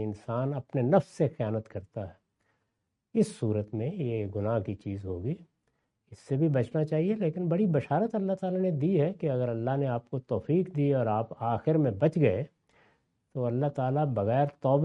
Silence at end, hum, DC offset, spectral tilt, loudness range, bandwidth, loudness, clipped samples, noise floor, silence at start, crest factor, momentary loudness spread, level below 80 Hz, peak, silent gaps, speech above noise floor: 0 s; none; under 0.1%; -9 dB/octave; 5 LU; 11 kHz; -29 LUFS; under 0.1%; -82 dBFS; 0 s; 20 dB; 9 LU; -68 dBFS; -8 dBFS; none; 53 dB